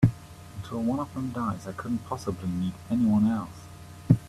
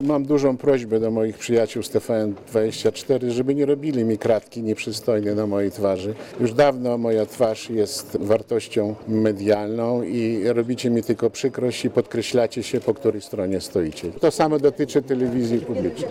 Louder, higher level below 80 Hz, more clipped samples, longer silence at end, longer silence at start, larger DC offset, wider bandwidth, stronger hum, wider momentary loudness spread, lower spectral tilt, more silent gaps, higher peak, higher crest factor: second, -29 LUFS vs -22 LUFS; first, -52 dBFS vs -58 dBFS; neither; about the same, 0 s vs 0 s; about the same, 0 s vs 0 s; neither; second, 13.5 kHz vs 16.5 kHz; neither; first, 20 LU vs 6 LU; first, -8 dB/octave vs -6 dB/octave; neither; about the same, -4 dBFS vs -6 dBFS; first, 22 dB vs 14 dB